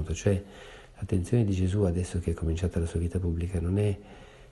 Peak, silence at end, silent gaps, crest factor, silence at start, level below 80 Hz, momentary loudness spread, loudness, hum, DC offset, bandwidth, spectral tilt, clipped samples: -12 dBFS; 0.05 s; none; 16 dB; 0 s; -40 dBFS; 15 LU; -29 LUFS; none; under 0.1%; 11.5 kHz; -7.5 dB/octave; under 0.1%